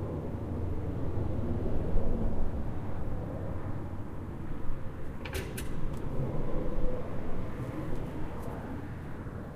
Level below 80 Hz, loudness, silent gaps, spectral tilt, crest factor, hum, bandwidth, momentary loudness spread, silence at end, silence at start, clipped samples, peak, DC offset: -36 dBFS; -37 LUFS; none; -7.5 dB/octave; 18 dB; none; 13 kHz; 7 LU; 0 s; 0 s; under 0.1%; -12 dBFS; under 0.1%